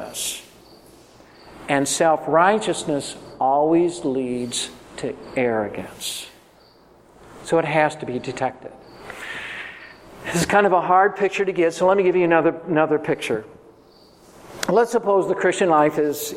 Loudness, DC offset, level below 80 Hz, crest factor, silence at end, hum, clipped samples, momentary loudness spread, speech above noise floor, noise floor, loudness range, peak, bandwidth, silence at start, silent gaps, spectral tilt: -20 LUFS; under 0.1%; -58 dBFS; 20 dB; 0 s; none; under 0.1%; 17 LU; 32 dB; -52 dBFS; 7 LU; -2 dBFS; 16.5 kHz; 0 s; none; -4.5 dB/octave